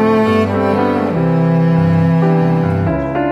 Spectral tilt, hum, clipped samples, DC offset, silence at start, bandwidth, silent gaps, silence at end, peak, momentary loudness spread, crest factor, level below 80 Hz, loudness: -9 dB/octave; none; under 0.1%; under 0.1%; 0 s; 5.8 kHz; none; 0 s; -2 dBFS; 3 LU; 12 dB; -38 dBFS; -14 LUFS